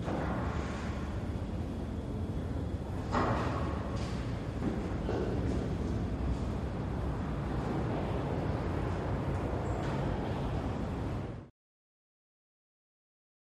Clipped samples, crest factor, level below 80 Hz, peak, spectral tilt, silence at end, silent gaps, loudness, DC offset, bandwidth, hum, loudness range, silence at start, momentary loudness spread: under 0.1%; 18 dB; -42 dBFS; -18 dBFS; -7.5 dB/octave; 2 s; none; -35 LUFS; under 0.1%; 12 kHz; none; 3 LU; 0 s; 4 LU